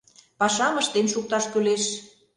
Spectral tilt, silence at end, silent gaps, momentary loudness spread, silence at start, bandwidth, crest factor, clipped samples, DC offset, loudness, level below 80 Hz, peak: -2.5 dB/octave; 0.3 s; none; 4 LU; 0.4 s; 11 kHz; 18 dB; under 0.1%; under 0.1%; -23 LUFS; -68 dBFS; -8 dBFS